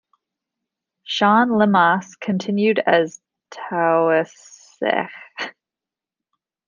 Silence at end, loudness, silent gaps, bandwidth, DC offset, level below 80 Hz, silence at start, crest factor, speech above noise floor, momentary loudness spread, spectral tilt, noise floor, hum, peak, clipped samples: 1.15 s; -18 LUFS; none; 7.4 kHz; under 0.1%; -68 dBFS; 1.1 s; 18 dB; 70 dB; 16 LU; -5.5 dB/octave; -88 dBFS; none; -2 dBFS; under 0.1%